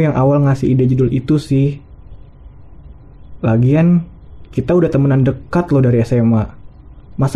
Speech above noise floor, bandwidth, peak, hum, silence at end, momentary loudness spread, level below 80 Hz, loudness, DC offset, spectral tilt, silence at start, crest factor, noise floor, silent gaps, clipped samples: 25 dB; 10.5 kHz; -4 dBFS; none; 0 s; 10 LU; -38 dBFS; -14 LUFS; 0.7%; -9.5 dB/octave; 0 s; 12 dB; -38 dBFS; none; under 0.1%